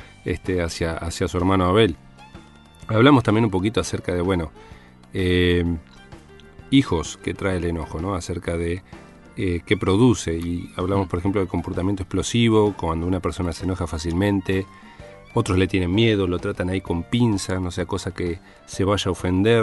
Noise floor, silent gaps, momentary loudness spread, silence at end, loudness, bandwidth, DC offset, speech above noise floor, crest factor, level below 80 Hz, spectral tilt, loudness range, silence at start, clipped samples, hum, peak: -45 dBFS; none; 10 LU; 0 s; -22 LUFS; 11.5 kHz; under 0.1%; 24 dB; 20 dB; -40 dBFS; -6 dB/octave; 4 LU; 0 s; under 0.1%; none; -2 dBFS